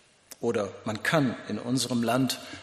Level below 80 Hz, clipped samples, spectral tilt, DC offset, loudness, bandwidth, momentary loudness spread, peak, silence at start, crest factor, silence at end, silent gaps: -66 dBFS; under 0.1%; -4.5 dB/octave; under 0.1%; -28 LUFS; 14.5 kHz; 8 LU; -8 dBFS; 0.3 s; 20 dB; 0 s; none